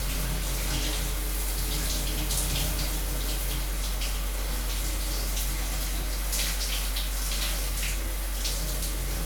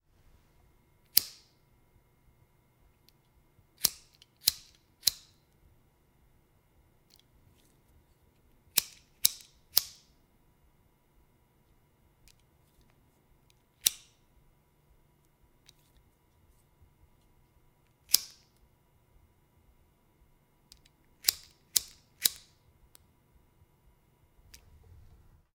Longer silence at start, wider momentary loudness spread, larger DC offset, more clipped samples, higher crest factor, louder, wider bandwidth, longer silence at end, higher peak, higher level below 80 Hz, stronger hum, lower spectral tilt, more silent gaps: second, 0 s vs 1.15 s; second, 3 LU vs 22 LU; neither; neither; second, 14 dB vs 38 dB; about the same, -30 LUFS vs -29 LUFS; first, over 20 kHz vs 16.5 kHz; second, 0 s vs 3.25 s; second, -14 dBFS vs -2 dBFS; first, -30 dBFS vs -68 dBFS; neither; first, -2.5 dB/octave vs 1.5 dB/octave; neither